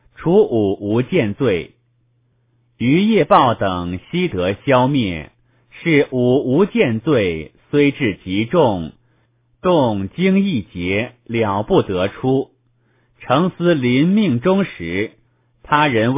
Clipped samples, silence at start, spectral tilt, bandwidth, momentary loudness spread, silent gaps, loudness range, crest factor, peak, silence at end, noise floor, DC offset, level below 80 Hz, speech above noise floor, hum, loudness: under 0.1%; 0.2 s; -11 dB/octave; 4 kHz; 9 LU; none; 2 LU; 18 dB; 0 dBFS; 0 s; -61 dBFS; under 0.1%; -44 dBFS; 45 dB; none; -17 LUFS